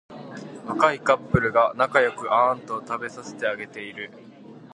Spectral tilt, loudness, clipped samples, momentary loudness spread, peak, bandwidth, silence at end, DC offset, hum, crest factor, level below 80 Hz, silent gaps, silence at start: -6 dB/octave; -23 LUFS; under 0.1%; 17 LU; -2 dBFS; 11 kHz; 0.15 s; under 0.1%; none; 22 dB; -50 dBFS; none; 0.1 s